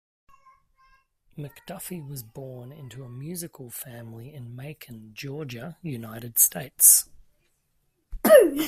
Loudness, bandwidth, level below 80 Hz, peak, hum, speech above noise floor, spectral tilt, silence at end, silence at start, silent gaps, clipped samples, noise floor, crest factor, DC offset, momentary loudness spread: -17 LUFS; 16 kHz; -52 dBFS; 0 dBFS; none; 43 dB; -3 dB/octave; 0 s; 1.4 s; none; under 0.1%; -71 dBFS; 26 dB; under 0.1%; 25 LU